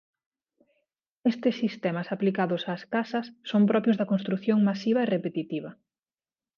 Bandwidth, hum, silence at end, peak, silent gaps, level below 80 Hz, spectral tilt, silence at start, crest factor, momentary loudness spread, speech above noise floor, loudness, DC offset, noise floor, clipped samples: 6.8 kHz; none; 0.85 s; -12 dBFS; none; -78 dBFS; -8 dB/octave; 1.25 s; 16 dB; 9 LU; over 64 dB; -27 LUFS; under 0.1%; under -90 dBFS; under 0.1%